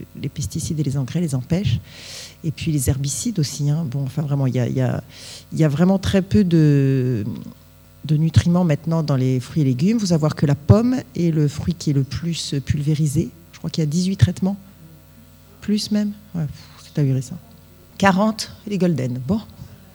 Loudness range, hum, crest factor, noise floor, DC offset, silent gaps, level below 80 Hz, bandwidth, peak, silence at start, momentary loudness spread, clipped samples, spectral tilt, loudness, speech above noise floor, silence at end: 5 LU; none; 20 dB; -46 dBFS; under 0.1%; none; -44 dBFS; over 20 kHz; 0 dBFS; 0 s; 13 LU; under 0.1%; -6.5 dB/octave; -20 LUFS; 27 dB; 0.2 s